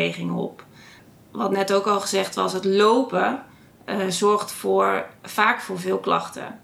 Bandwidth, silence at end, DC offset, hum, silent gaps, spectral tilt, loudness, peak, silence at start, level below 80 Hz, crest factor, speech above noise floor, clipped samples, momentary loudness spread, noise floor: 15.5 kHz; 0.05 s; under 0.1%; none; none; -4 dB/octave; -22 LUFS; -2 dBFS; 0 s; -70 dBFS; 20 dB; 27 dB; under 0.1%; 11 LU; -49 dBFS